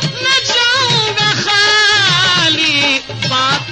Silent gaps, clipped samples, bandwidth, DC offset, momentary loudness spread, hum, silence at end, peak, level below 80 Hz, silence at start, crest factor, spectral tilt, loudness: none; under 0.1%; 9.4 kHz; under 0.1%; 5 LU; none; 0 s; -2 dBFS; -48 dBFS; 0 s; 12 dB; -2 dB/octave; -10 LUFS